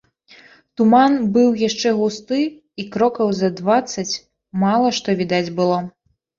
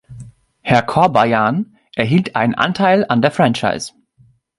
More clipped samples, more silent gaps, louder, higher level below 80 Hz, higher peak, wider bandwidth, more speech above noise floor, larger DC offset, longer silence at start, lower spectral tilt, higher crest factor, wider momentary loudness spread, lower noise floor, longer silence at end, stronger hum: neither; neither; second, -18 LUFS vs -15 LUFS; second, -60 dBFS vs -52 dBFS; about the same, -2 dBFS vs 0 dBFS; second, 7.6 kHz vs 11.5 kHz; second, 31 dB vs 39 dB; neither; first, 0.8 s vs 0.1 s; about the same, -5.5 dB/octave vs -6 dB/octave; about the same, 16 dB vs 16 dB; about the same, 12 LU vs 11 LU; second, -49 dBFS vs -53 dBFS; second, 0.5 s vs 0.7 s; neither